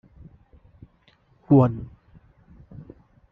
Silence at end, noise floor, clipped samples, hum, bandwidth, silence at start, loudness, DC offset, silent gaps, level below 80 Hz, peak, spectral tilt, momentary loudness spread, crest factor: 1.45 s; -61 dBFS; under 0.1%; none; 3.6 kHz; 1.5 s; -20 LUFS; under 0.1%; none; -54 dBFS; -6 dBFS; -11.5 dB/octave; 27 LU; 22 dB